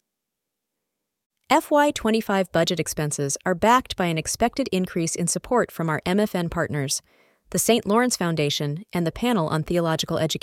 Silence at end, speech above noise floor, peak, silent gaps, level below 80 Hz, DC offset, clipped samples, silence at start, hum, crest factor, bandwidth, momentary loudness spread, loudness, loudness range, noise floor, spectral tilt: 0.05 s; 60 dB; -4 dBFS; none; -50 dBFS; under 0.1%; under 0.1%; 1.5 s; none; 20 dB; 17 kHz; 6 LU; -23 LUFS; 2 LU; -83 dBFS; -4.5 dB/octave